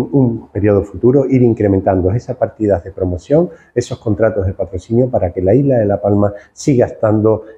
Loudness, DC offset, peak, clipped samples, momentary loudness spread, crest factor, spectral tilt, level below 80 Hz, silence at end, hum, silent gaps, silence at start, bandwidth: -15 LUFS; under 0.1%; 0 dBFS; under 0.1%; 8 LU; 14 dB; -8.5 dB/octave; -42 dBFS; 0.05 s; none; none; 0 s; 9.6 kHz